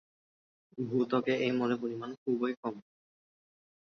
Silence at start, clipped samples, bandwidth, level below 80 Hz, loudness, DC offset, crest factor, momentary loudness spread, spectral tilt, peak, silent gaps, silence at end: 0.75 s; under 0.1%; 6.4 kHz; -80 dBFS; -33 LUFS; under 0.1%; 20 dB; 11 LU; -7 dB/octave; -16 dBFS; 2.18-2.26 s, 2.57-2.63 s; 1.15 s